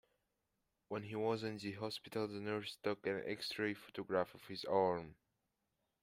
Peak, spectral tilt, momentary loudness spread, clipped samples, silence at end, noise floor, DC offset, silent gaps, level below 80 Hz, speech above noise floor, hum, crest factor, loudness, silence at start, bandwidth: -22 dBFS; -5.5 dB/octave; 10 LU; under 0.1%; 0.9 s; -87 dBFS; under 0.1%; none; -78 dBFS; 46 dB; none; 22 dB; -41 LUFS; 0.9 s; 16 kHz